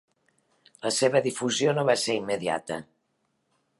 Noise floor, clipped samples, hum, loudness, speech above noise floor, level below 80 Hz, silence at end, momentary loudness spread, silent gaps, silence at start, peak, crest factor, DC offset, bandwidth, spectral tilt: -74 dBFS; under 0.1%; none; -26 LUFS; 49 dB; -70 dBFS; 0.95 s; 11 LU; none; 0.85 s; -8 dBFS; 22 dB; under 0.1%; 11.5 kHz; -3.5 dB/octave